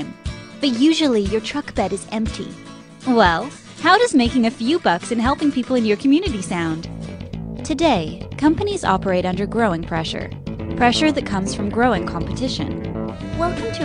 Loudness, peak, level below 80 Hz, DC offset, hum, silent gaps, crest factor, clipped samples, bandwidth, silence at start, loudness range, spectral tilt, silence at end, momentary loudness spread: -19 LUFS; 0 dBFS; -38 dBFS; under 0.1%; none; none; 18 dB; under 0.1%; 10.5 kHz; 0 s; 3 LU; -5 dB/octave; 0 s; 14 LU